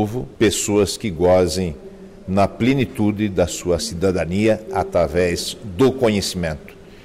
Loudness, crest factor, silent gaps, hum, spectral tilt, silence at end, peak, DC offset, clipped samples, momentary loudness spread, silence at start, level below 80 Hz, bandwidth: -19 LUFS; 12 dB; none; none; -5 dB/octave; 0 s; -8 dBFS; under 0.1%; under 0.1%; 10 LU; 0 s; -40 dBFS; 16 kHz